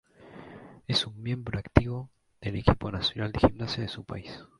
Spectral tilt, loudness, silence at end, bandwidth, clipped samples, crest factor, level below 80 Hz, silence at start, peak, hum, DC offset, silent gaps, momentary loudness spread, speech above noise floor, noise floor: -6.5 dB/octave; -29 LUFS; 0.15 s; 11.5 kHz; under 0.1%; 28 dB; -42 dBFS; 0.2 s; 0 dBFS; none; under 0.1%; none; 21 LU; 20 dB; -49 dBFS